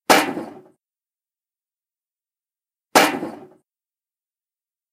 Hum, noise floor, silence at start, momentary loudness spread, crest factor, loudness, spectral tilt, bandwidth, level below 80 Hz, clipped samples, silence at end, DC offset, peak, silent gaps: none; under -90 dBFS; 0.1 s; 18 LU; 24 dB; -18 LUFS; -2 dB/octave; 16 kHz; -68 dBFS; under 0.1%; 1.5 s; under 0.1%; 0 dBFS; none